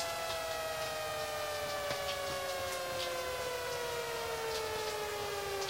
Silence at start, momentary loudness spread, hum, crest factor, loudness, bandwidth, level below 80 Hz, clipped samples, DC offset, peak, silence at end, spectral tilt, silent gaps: 0 s; 1 LU; none; 14 dB; -37 LUFS; 16 kHz; -60 dBFS; under 0.1%; under 0.1%; -24 dBFS; 0 s; -2 dB/octave; none